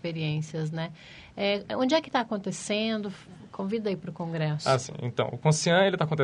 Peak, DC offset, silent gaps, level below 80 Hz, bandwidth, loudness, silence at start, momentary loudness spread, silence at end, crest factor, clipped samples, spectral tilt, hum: -8 dBFS; under 0.1%; none; -64 dBFS; 11 kHz; -28 LUFS; 0.05 s; 14 LU; 0 s; 20 dB; under 0.1%; -5 dB/octave; none